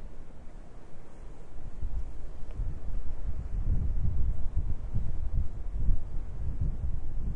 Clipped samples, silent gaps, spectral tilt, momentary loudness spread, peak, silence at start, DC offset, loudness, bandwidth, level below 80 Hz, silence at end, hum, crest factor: under 0.1%; none; -9 dB/octave; 18 LU; -10 dBFS; 0 s; under 0.1%; -37 LUFS; 2.1 kHz; -32 dBFS; 0 s; none; 16 dB